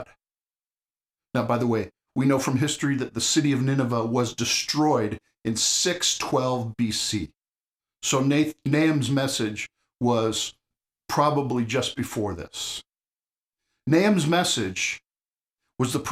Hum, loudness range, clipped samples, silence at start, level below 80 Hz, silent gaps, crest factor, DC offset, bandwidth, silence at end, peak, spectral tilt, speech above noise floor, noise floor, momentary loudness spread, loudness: none; 3 LU; under 0.1%; 0 s; -58 dBFS; 0.41-0.47 s, 7.67-7.71 s, 13.45-13.49 s, 15.53-15.57 s; 18 dB; under 0.1%; 15.5 kHz; 0 s; -8 dBFS; -4 dB/octave; over 66 dB; under -90 dBFS; 10 LU; -24 LUFS